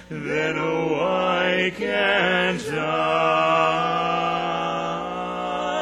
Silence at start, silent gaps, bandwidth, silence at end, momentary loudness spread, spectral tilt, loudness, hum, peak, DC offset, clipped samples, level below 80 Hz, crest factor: 0 s; none; 13.5 kHz; 0 s; 8 LU; -5 dB/octave; -22 LUFS; none; -6 dBFS; under 0.1%; under 0.1%; -54 dBFS; 18 dB